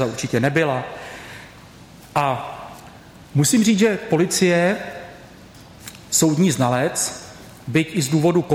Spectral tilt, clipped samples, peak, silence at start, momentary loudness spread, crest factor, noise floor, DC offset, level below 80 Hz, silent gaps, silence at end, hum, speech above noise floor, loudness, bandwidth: -4.5 dB/octave; under 0.1%; -4 dBFS; 0 s; 22 LU; 16 dB; -43 dBFS; under 0.1%; -54 dBFS; none; 0 s; none; 25 dB; -19 LUFS; 17 kHz